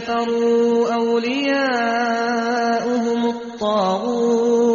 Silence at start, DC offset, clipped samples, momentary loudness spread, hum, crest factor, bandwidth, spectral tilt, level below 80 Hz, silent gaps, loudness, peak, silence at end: 0 s; under 0.1%; under 0.1%; 4 LU; none; 10 dB; 7.2 kHz; -3 dB/octave; -60 dBFS; none; -19 LUFS; -8 dBFS; 0 s